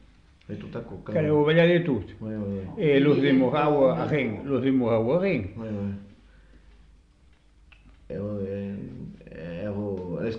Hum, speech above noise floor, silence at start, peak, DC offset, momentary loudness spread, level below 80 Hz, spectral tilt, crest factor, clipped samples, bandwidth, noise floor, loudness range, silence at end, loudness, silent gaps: none; 34 dB; 0.5 s; -8 dBFS; under 0.1%; 18 LU; -54 dBFS; -9 dB/octave; 18 dB; under 0.1%; 6.2 kHz; -57 dBFS; 15 LU; 0 s; -25 LUFS; none